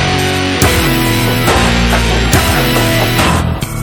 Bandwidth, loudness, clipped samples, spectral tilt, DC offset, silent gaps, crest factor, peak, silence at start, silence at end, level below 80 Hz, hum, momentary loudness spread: 19 kHz; -11 LUFS; under 0.1%; -4.5 dB/octave; under 0.1%; none; 12 dB; 0 dBFS; 0 s; 0 s; -20 dBFS; none; 2 LU